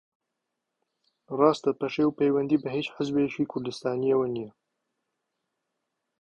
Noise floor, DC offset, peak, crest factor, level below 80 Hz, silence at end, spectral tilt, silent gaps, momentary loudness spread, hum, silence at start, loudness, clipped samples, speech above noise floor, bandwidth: -83 dBFS; under 0.1%; -6 dBFS; 22 dB; -68 dBFS; 1.7 s; -7 dB/octave; none; 8 LU; none; 1.3 s; -27 LUFS; under 0.1%; 57 dB; 9.2 kHz